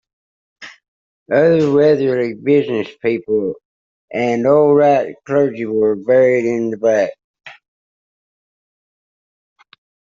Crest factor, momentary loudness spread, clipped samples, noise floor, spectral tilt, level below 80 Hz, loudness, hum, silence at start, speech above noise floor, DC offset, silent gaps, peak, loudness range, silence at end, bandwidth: 16 dB; 8 LU; under 0.1%; under -90 dBFS; -7.5 dB/octave; -60 dBFS; -15 LUFS; none; 0.6 s; over 76 dB; under 0.1%; 0.88-1.26 s, 3.65-4.08 s, 7.24-7.34 s; -2 dBFS; 7 LU; 2.65 s; 7.4 kHz